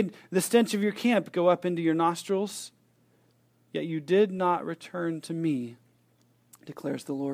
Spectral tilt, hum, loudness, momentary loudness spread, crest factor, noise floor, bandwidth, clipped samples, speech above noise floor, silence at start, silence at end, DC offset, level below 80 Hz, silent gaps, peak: -5.5 dB/octave; none; -28 LUFS; 13 LU; 20 dB; -66 dBFS; 16 kHz; under 0.1%; 38 dB; 0 s; 0 s; under 0.1%; -80 dBFS; none; -10 dBFS